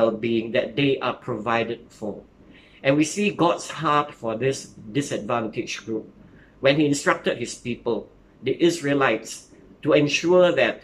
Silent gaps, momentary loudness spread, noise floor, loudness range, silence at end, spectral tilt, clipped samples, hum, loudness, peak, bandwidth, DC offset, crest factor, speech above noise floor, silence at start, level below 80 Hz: none; 13 LU; -50 dBFS; 2 LU; 0.05 s; -5 dB/octave; under 0.1%; none; -23 LUFS; -4 dBFS; 14 kHz; under 0.1%; 20 dB; 28 dB; 0 s; -58 dBFS